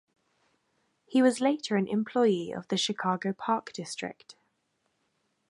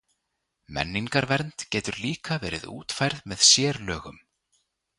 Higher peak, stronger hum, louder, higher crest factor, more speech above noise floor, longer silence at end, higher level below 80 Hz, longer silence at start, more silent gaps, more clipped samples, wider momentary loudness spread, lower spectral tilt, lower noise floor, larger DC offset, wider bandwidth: second, -12 dBFS vs -4 dBFS; neither; second, -29 LUFS vs -24 LUFS; second, 18 dB vs 24 dB; second, 48 dB vs 53 dB; first, 1.15 s vs 0.85 s; second, -78 dBFS vs -52 dBFS; first, 1.1 s vs 0.7 s; neither; neither; second, 12 LU vs 17 LU; first, -5 dB/octave vs -2.5 dB/octave; about the same, -76 dBFS vs -79 dBFS; neither; about the same, 11.5 kHz vs 11.5 kHz